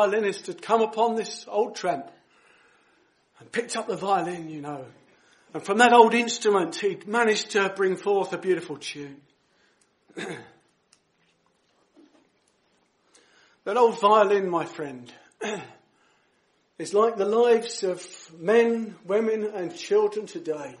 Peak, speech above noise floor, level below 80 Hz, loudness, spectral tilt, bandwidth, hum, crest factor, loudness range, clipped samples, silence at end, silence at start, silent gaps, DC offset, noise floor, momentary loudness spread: -2 dBFS; 44 dB; -80 dBFS; -24 LUFS; -4 dB/octave; 11.5 kHz; none; 24 dB; 15 LU; under 0.1%; 0.05 s; 0 s; none; under 0.1%; -68 dBFS; 18 LU